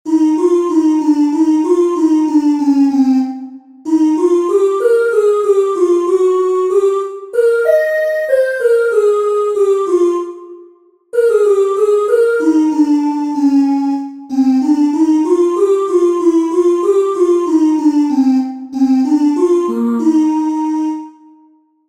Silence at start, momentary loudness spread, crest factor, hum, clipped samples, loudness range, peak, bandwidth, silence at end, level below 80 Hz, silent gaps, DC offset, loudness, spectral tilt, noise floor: 0.05 s; 5 LU; 12 dB; none; under 0.1%; 2 LU; -2 dBFS; 12.5 kHz; 0.8 s; -66 dBFS; none; under 0.1%; -13 LUFS; -5 dB/octave; -50 dBFS